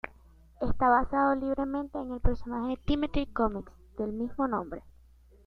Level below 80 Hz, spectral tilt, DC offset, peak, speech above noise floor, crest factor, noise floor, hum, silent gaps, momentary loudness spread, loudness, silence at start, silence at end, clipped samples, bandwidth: -38 dBFS; -8.5 dB/octave; under 0.1%; -10 dBFS; 29 dB; 18 dB; -57 dBFS; none; none; 15 LU; -30 LUFS; 0.05 s; 0.55 s; under 0.1%; 5.6 kHz